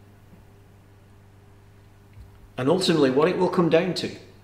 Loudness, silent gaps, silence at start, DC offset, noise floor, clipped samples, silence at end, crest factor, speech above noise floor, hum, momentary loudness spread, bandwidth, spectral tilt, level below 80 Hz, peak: -22 LUFS; none; 2.15 s; under 0.1%; -51 dBFS; under 0.1%; 0.25 s; 20 dB; 30 dB; 50 Hz at -50 dBFS; 11 LU; 15.5 kHz; -6 dB/octave; -56 dBFS; -6 dBFS